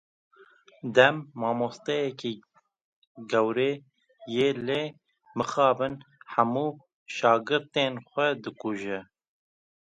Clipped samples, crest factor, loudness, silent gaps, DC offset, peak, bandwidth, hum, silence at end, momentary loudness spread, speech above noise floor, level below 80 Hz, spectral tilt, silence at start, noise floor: under 0.1%; 26 dB; -27 LUFS; 2.81-3.15 s, 6.94-7.06 s; under 0.1%; -4 dBFS; 9.2 kHz; none; 0.95 s; 15 LU; 31 dB; -72 dBFS; -5 dB/octave; 0.85 s; -57 dBFS